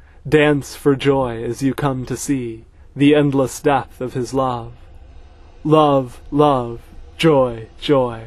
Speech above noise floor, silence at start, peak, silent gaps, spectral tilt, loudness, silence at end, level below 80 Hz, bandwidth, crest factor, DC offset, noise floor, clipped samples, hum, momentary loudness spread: 24 dB; 0.25 s; 0 dBFS; none; -6 dB/octave; -18 LUFS; 0 s; -42 dBFS; 13.5 kHz; 18 dB; under 0.1%; -41 dBFS; under 0.1%; none; 14 LU